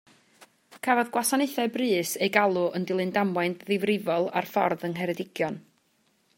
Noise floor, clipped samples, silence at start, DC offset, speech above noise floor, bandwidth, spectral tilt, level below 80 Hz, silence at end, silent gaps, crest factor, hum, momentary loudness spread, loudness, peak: -68 dBFS; under 0.1%; 0.7 s; under 0.1%; 42 dB; 16.5 kHz; -4.5 dB/octave; -76 dBFS; 0.8 s; none; 22 dB; none; 7 LU; -26 LUFS; -4 dBFS